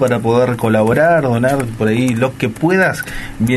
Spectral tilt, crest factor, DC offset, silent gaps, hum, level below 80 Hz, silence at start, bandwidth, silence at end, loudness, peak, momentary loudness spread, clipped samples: -6.5 dB/octave; 12 dB; under 0.1%; none; none; -38 dBFS; 0 s; 12.5 kHz; 0 s; -14 LUFS; -2 dBFS; 6 LU; under 0.1%